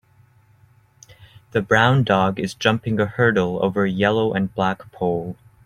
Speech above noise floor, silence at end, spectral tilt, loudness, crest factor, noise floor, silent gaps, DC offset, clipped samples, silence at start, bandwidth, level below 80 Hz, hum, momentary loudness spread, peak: 35 dB; 0.3 s; -6.5 dB/octave; -20 LUFS; 20 dB; -55 dBFS; none; under 0.1%; under 0.1%; 1.2 s; 12 kHz; -54 dBFS; none; 9 LU; -2 dBFS